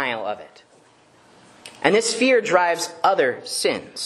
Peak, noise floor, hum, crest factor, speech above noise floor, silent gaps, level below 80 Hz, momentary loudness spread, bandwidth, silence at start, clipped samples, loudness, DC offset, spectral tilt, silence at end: 0 dBFS; -54 dBFS; none; 22 dB; 33 dB; none; -70 dBFS; 9 LU; 12.5 kHz; 0 s; under 0.1%; -20 LUFS; under 0.1%; -2.5 dB/octave; 0 s